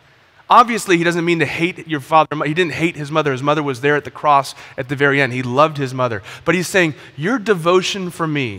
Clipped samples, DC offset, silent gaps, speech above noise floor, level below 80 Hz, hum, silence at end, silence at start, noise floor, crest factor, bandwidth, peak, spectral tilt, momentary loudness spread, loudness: under 0.1%; under 0.1%; none; 28 dB; -58 dBFS; none; 0 s; 0.5 s; -45 dBFS; 16 dB; 16 kHz; 0 dBFS; -5 dB/octave; 7 LU; -17 LUFS